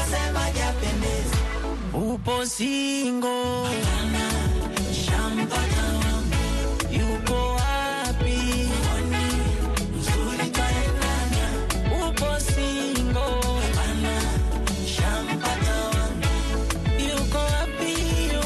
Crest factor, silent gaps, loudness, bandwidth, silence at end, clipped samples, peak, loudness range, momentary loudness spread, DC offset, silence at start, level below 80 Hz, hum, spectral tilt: 14 dB; none; -25 LUFS; 12.5 kHz; 0 s; under 0.1%; -10 dBFS; 1 LU; 2 LU; under 0.1%; 0 s; -28 dBFS; none; -4.5 dB/octave